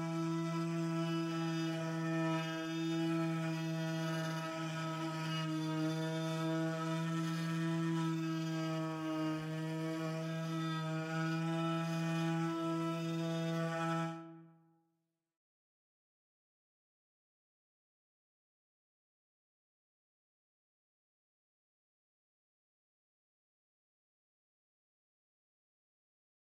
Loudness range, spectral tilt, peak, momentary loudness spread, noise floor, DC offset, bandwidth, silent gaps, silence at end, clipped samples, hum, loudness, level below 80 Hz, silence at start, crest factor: 3 LU; -6.5 dB/octave; -26 dBFS; 4 LU; -85 dBFS; under 0.1%; 15 kHz; none; 12 s; under 0.1%; none; -38 LUFS; under -90 dBFS; 0 s; 14 dB